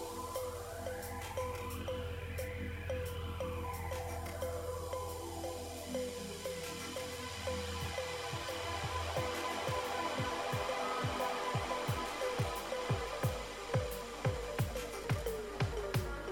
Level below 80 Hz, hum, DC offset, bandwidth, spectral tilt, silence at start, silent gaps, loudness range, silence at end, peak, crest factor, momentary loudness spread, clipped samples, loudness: -50 dBFS; none; under 0.1%; 17 kHz; -4.5 dB/octave; 0 s; none; 5 LU; 0 s; -22 dBFS; 16 dB; 6 LU; under 0.1%; -39 LUFS